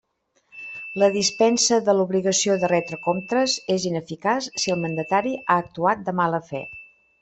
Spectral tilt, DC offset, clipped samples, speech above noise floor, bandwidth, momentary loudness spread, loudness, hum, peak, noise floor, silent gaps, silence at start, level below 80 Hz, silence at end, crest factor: -3.5 dB/octave; under 0.1%; under 0.1%; 43 dB; 8.4 kHz; 14 LU; -22 LUFS; none; -4 dBFS; -65 dBFS; none; 0.55 s; -64 dBFS; 0.35 s; 18 dB